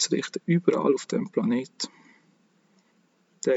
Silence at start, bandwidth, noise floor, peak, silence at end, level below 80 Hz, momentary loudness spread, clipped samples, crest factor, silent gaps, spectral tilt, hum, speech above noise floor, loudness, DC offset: 0 s; 8 kHz; -66 dBFS; -6 dBFS; 0 s; under -90 dBFS; 11 LU; under 0.1%; 22 dB; none; -5 dB/octave; none; 40 dB; -26 LUFS; under 0.1%